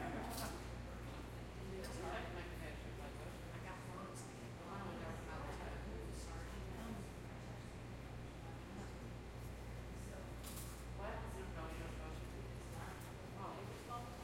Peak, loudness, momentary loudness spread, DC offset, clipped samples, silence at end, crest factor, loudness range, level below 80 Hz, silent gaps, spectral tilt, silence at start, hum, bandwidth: -32 dBFS; -50 LUFS; 5 LU; under 0.1%; under 0.1%; 0 s; 16 dB; 2 LU; -54 dBFS; none; -5.5 dB/octave; 0 s; none; 16.5 kHz